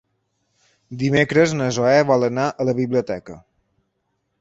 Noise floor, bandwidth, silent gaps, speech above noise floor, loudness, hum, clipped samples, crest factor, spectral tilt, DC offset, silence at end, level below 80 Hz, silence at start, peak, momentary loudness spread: -72 dBFS; 8 kHz; none; 54 dB; -19 LUFS; none; under 0.1%; 18 dB; -6 dB/octave; under 0.1%; 1 s; -56 dBFS; 0.9 s; -2 dBFS; 12 LU